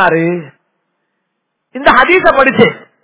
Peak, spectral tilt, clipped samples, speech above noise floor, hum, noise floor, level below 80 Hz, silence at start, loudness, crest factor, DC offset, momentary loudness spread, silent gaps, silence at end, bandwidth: 0 dBFS; -9 dB/octave; 1%; 60 dB; none; -70 dBFS; -42 dBFS; 0 s; -9 LUFS; 12 dB; under 0.1%; 12 LU; none; 0.25 s; 4 kHz